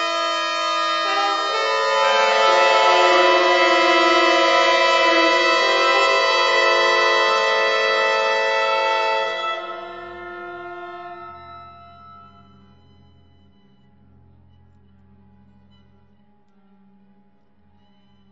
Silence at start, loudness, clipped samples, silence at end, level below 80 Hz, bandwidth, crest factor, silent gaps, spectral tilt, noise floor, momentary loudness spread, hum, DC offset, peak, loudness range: 0 s; -16 LUFS; under 0.1%; 6.2 s; -68 dBFS; 8 kHz; 18 dB; none; -1 dB/octave; -59 dBFS; 19 LU; none; 0.2%; -2 dBFS; 17 LU